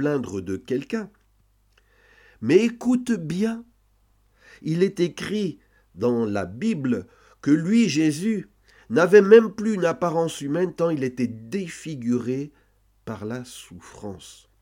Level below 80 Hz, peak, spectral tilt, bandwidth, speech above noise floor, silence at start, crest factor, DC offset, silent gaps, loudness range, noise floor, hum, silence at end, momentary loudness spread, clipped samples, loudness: -62 dBFS; 0 dBFS; -6 dB/octave; 16 kHz; 40 dB; 0 s; 22 dB; under 0.1%; none; 8 LU; -62 dBFS; none; 0.3 s; 18 LU; under 0.1%; -23 LUFS